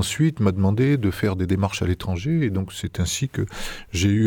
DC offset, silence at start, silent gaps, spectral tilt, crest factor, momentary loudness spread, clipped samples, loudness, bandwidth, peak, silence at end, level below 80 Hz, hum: under 0.1%; 0 s; none; -6 dB/octave; 14 dB; 8 LU; under 0.1%; -23 LUFS; 18 kHz; -8 dBFS; 0 s; -40 dBFS; none